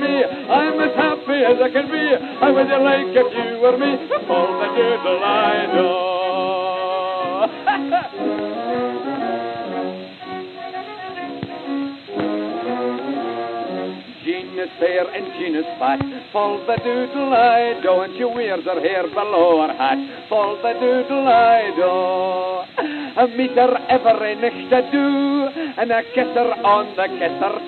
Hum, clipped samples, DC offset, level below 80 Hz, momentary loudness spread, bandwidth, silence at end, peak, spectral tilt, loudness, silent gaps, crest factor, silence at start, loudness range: none; under 0.1%; under 0.1%; -64 dBFS; 11 LU; 4.5 kHz; 0 s; -2 dBFS; -7.5 dB/octave; -19 LUFS; none; 16 dB; 0 s; 8 LU